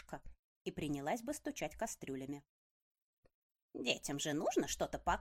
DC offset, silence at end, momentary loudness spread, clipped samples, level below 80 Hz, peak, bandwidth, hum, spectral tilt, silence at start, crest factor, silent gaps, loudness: under 0.1%; 0 s; 13 LU; under 0.1%; -60 dBFS; -18 dBFS; 16 kHz; none; -3.5 dB/octave; 0 s; 24 dB; 0.39-0.65 s, 2.49-2.95 s, 3.02-3.23 s, 3.34-3.50 s, 3.62-3.69 s; -41 LUFS